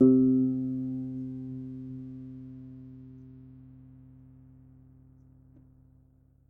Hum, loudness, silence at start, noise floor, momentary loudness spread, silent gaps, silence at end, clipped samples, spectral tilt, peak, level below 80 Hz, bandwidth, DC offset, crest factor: 60 Hz at -65 dBFS; -30 LUFS; 0 s; -62 dBFS; 27 LU; none; 2.8 s; under 0.1%; -13.5 dB/octave; -10 dBFS; -62 dBFS; 1.4 kHz; under 0.1%; 22 dB